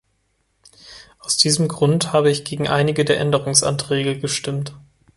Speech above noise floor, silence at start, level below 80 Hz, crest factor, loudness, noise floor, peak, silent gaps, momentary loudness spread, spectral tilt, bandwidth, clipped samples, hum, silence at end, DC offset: 48 dB; 0.85 s; -54 dBFS; 20 dB; -18 LUFS; -67 dBFS; 0 dBFS; none; 8 LU; -4 dB/octave; 12 kHz; under 0.1%; none; 0.4 s; under 0.1%